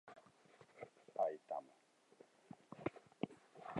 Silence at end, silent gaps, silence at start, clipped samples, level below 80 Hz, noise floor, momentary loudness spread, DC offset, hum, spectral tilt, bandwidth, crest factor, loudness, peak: 0 s; none; 0.05 s; under 0.1%; -84 dBFS; -72 dBFS; 26 LU; under 0.1%; none; -7 dB/octave; 11 kHz; 24 dB; -48 LUFS; -26 dBFS